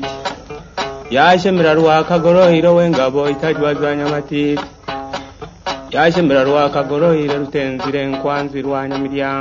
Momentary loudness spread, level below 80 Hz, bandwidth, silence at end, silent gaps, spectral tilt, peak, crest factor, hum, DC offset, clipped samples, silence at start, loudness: 14 LU; -44 dBFS; 7.6 kHz; 0 s; none; -6.5 dB/octave; 0 dBFS; 14 dB; none; under 0.1%; under 0.1%; 0 s; -15 LUFS